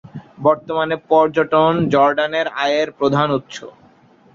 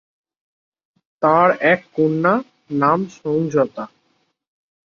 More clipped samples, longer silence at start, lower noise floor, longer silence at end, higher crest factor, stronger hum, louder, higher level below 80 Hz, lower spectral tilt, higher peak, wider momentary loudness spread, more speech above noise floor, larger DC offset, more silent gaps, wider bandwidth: neither; second, 0.05 s vs 1.2 s; second, -50 dBFS vs -66 dBFS; second, 0.65 s vs 1 s; about the same, 16 dB vs 18 dB; neither; about the same, -17 LUFS vs -18 LUFS; first, -56 dBFS vs -62 dBFS; second, -6 dB/octave vs -7.5 dB/octave; about the same, -2 dBFS vs -2 dBFS; about the same, 7 LU vs 9 LU; second, 34 dB vs 49 dB; neither; neither; about the same, 7.6 kHz vs 7.2 kHz